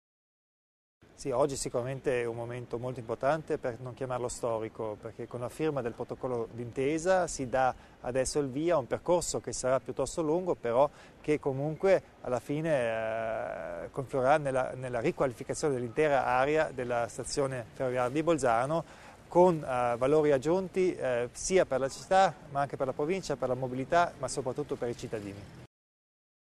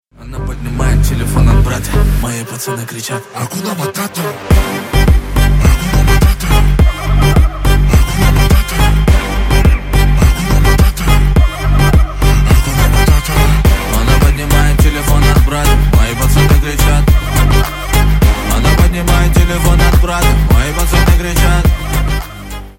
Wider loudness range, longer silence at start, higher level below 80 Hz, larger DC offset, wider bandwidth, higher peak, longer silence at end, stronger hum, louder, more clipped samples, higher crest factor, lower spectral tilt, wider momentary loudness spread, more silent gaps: about the same, 6 LU vs 4 LU; first, 1.2 s vs 0.2 s; second, -56 dBFS vs -12 dBFS; neither; second, 13.5 kHz vs 17 kHz; second, -12 dBFS vs 0 dBFS; first, 0.75 s vs 0.05 s; neither; second, -31 LUFS vs -12 LUFS; neither; first, 20 dB vs 10 dB; about the same, -5 dB/octave vs -5.5 dB/octave; first, 11 LU vs 8 LU; neither